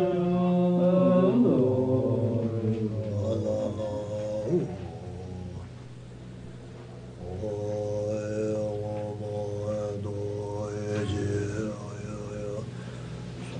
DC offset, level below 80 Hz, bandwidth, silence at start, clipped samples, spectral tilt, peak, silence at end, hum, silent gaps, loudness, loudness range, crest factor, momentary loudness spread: under 0.1%; -54 dBFS; 9.8 kHz; 0 s; under 0.1%; -8.5 dB/octave; -12 dBFS; 0 s; none; none; -29 LUFS; 11 LU; 16 dB; 19 LU